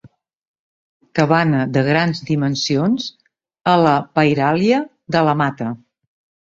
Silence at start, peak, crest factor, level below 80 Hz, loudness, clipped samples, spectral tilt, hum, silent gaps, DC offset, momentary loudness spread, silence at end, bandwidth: 0.05 s; 0 dBFS; 18 dB; -58 dBFS; -17 LUFS; under 0.1%; -6 dB/octave; none; 0.36-1.00 s; under 0.1%; 9 LU; 0.7 s; 7.8 kHz